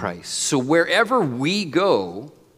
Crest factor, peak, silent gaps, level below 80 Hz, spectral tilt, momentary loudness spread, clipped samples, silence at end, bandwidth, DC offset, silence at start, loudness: 16 dB; -4 dBFS; none; -68 dBFS; -4 dB/octave; 8 LU; under 0.1%; 0.3 s; 16 kHz; under 0.1%; 0 s; -20 LUFS